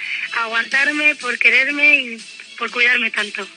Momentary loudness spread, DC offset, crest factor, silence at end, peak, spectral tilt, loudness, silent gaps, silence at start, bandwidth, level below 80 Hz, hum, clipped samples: 14 LU; under 0.1%; 18 dB; 0 s; 0 dBFS; -1 dB/octave; -15 LUFS; none; 0 s; 10 kHz; under -90 dBFS; none; under 0.1%